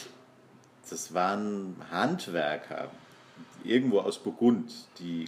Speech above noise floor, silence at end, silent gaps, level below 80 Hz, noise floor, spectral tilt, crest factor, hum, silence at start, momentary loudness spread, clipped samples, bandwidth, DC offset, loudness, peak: 28 dB; 0 s; none; -80 dBFS; -57 dBFS; -5 dB/octave; 20 dB; none; 0 s; 16 LU; under 0.1%; 15.5 kHz; under 0.1%; -30 LUFS; -10 dBFS